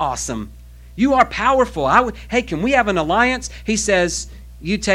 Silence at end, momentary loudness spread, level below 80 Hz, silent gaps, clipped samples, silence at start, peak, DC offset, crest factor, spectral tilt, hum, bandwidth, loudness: 0 s; 13 LU; -36 dBFS; none; under 0.1%; 0 s; 0 dBFS; under 0.1%; 18 dB; -4 dB/octave; none; 16 kHz; -18 LUFS